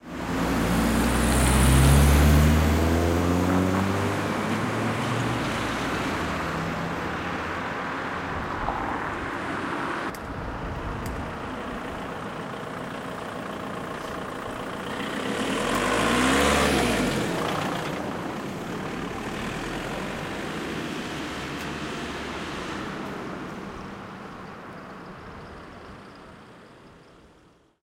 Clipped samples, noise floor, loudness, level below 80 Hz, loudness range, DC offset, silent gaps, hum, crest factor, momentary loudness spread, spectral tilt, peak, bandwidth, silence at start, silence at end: under 0.1%; -58 dBFS; -26 LUFS; -34 dBFS; 15 LU; under 0.1%; none; none; 20 dB; 17 LU; -5 dB/octave; -6 dBFS; 16 kHz; 0.05 s; 0.8 s